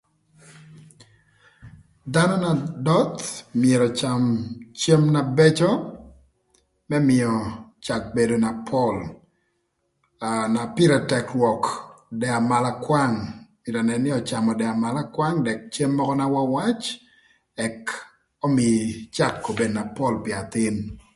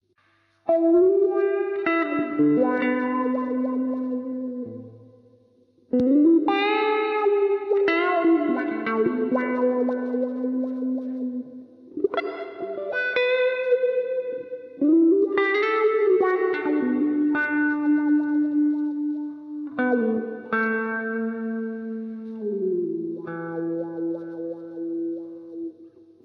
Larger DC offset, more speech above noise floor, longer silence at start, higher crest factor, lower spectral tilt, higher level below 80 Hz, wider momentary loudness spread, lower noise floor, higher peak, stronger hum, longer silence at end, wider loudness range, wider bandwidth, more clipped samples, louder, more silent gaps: neither; first, 51 dB vs 45 dB; second, 0.5 s vs 0.65 s; about the same, 20 dB vs 16 dB; second, -6 dB/octave vs -8 dB/octave; first, -54 dBFS vs -72 dBFS; about the same, 13 LU vs 13 LU; first, -72 dBFS vs -64 dBFS; first, -4 dBFS vs -8 dBFS; neither; second, 0.15 s vs 0.35 s; second, 4 LU vs 8 LU; first, 11.5 kHz vs 5.8 kHz; neither; about the same, -23 LUFS vs -23 LUFS; neither